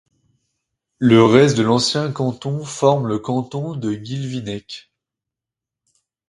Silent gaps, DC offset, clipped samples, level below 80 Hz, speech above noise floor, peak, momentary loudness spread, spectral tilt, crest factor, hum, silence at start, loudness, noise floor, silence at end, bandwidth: none; under 0.1%; under 0.1%; -56 dBFS; 69 dB; 0 dBFS; 15 LU; -6 dB/octave; 20 dB; none; 1 s; -18 LUFS; -86 dBFS; 1.5 s; 11.5 kHz